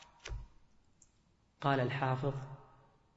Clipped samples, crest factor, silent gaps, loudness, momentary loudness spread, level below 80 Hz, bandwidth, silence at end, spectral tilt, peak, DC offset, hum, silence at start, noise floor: under 0.1%; 20 dB; none; -36 LUFS; 18 LU; -56 dBFS; 7.6 kHz; 0.5 s; -5.5 dB/octave; -18 dBFS; under 0.1%; none; 0 s; -71 dBFS